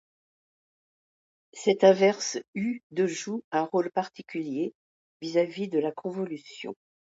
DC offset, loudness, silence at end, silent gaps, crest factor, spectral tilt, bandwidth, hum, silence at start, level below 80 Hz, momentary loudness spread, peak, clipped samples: under 0.1%; -27 LUFS; 0.4 s; 2.48-2.53 s, 2.83-2.90 s, 3.44-3.51 s, 4.75-5.20 s; 22 dB; -4.5 dB/octave; 8 kHz; none; 1.55 s; -78 dBFS; 17 LU; -6 dBFS; under 0.1%